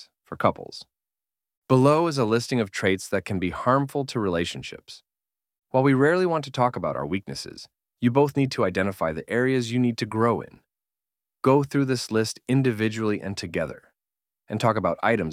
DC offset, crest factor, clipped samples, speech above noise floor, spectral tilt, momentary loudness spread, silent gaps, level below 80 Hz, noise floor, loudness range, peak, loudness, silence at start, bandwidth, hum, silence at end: under 0.1%; 20 dB; under 0.1%; over 66 dB; -6 dB/octave; 14 LU; 1.57-1.62 s; -58 dBFS; under -90 dBFS; 2 LU; -6 dBFS; -24 LUFS; 0 s; 15.5 kHz; none; 0 s